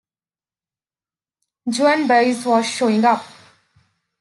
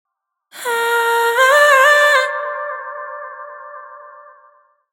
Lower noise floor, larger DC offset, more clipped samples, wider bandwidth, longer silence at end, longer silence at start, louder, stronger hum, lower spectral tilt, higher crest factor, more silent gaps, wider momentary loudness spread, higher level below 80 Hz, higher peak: first, under -90 dBFS vs -53 dBFS; neither; neither; second, 12 kHz vs 19 kHz; about the same, 0.9 s vs 0.8 s; first, 1.65 s vs 0.55 s; second, -17 LUFS vs -13 LUFS; neither; first, -4 dB/octave vs 2.5 dB/octave; about the same, 18 dB vs 16 dB; neither; second, 9 LU vs 24 LU; first, -74 dBFS vs under -90 dBFS; second, -4 dBFS vs 0 dBFS